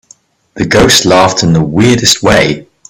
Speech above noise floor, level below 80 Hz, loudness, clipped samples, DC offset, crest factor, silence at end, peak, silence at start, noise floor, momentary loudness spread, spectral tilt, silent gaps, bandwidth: 37 dB; -32 dBFS; -8 LUFS; 0.4%; under 0.1%; 10 dB; 0.25 s; 0 dBFS; 0.55 s; -44 dBFS; 6 LU; -4 dB/octave; none; over 20 kHz